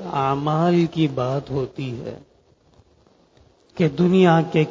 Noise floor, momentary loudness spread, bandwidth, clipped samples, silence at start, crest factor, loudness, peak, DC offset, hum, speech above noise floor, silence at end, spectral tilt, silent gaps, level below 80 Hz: -57 dBFS; 14 LU; 7.6 kHz; under 0.1%; 0 s; 18 dB; -20 LUFS; -2 dBFS; under 0.1%; none; 38 dB; 0 s; -8 dB/octave; none; -54 dBFS